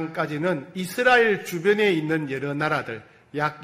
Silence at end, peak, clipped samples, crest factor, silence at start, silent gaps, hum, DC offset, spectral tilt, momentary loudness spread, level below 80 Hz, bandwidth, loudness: 0 s; -4 dBFS; under 0.1%; 18 dB; 0 s; none; none; under 0.1%; -5.5 dB/octave; 12 LU; -62 dBFS; 16 kHz; -23 LUFS